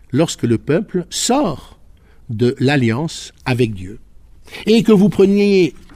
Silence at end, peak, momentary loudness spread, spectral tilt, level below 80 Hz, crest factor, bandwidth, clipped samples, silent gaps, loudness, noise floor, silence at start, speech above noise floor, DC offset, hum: 0.2 s; 0 dBFS; 15 LU; -5.5 dB/octave; -44 dBFS; 16 dB; 15.5 kHz; under 0.1%; none; -16 LUFS; -44 dBFS; 0.1 s; 29 dB; under 0.1%; none